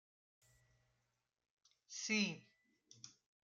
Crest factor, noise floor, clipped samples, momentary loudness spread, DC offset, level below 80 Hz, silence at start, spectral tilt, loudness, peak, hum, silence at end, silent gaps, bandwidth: 24 dB; -87 dBFS; under 0.1%; 21 LU; under 0.1%; -90 dBFS; 1.9 s; -2.5 dB/octave; -40 LUFS; -26 dBFS; none; 0.4 s; none; 8.2 kHz